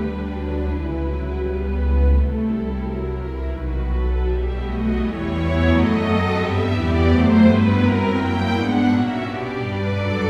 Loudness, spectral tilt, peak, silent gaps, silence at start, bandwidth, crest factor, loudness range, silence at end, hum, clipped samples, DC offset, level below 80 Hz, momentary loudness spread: -20 LUFS; -8.5 dB/octave; -2 dBFS; none; 0 s; 7.6 kHz; 18 dB; 5 LU; 0 s; none; under 0.1%; under 0.1%; -26 dBFS; 10 LU